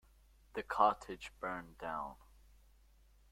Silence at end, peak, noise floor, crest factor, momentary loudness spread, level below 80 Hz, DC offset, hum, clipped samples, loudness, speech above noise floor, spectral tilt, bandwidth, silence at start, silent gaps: 1.2 s; -16 dBFS; -66 dBFS; 26 dB; 16 LU; -64 dBFS; under 0.1%; none; under 0.1%; -39 LUFS; 28 dB; -4.5 dB/octave; 16 kHz; 0.55 s; none